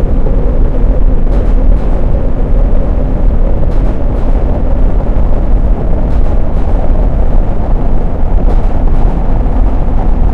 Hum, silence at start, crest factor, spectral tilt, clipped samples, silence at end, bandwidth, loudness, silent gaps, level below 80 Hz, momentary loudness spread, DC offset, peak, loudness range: none; 0 s; 6 dB; -10 dB/octave; 1%; 0 s; 3.1 kHz; -14 LUFS; none; -8 dBFS; 2 LU; 3%; 0 dBFS; 1 LU